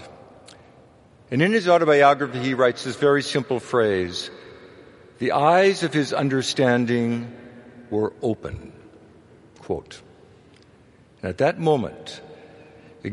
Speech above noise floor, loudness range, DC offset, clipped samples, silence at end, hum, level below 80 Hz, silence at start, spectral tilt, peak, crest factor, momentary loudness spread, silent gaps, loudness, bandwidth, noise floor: 32 dB; 12 LU; under 0.1%; under 0.1%; 0 s; none; -58 dBFS; 0 s; -5.5 dB/octave; -2 dBFS; 22 dB; 19 LU; none; -21 LUFS; 11.5 kHz; -53 dBFS